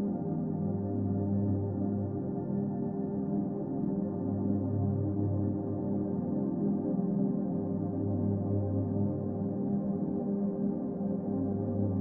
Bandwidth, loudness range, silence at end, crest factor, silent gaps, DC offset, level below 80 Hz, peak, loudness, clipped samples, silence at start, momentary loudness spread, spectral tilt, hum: 1.9 kHz; 1 LU; 0 s; 12 dB; none; under 0.1%; -62 dBFS; -18 dBFS; -32 LUFS; under 0.1%; 0 s; 3 LU; -15 dB/octave; none